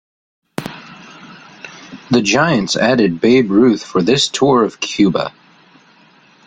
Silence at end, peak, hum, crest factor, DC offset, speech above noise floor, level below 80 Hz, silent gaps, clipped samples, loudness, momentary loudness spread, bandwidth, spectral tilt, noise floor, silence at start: 1.15 s; 0 dBFS; none; 16 dB; under 0.1%; 35 dB; -52 dBFS; none; under 0.1%; -14 LUFS; 21 LU; 11 kHz; -4.5 dB/octave; -49 dBFS; 0.6 s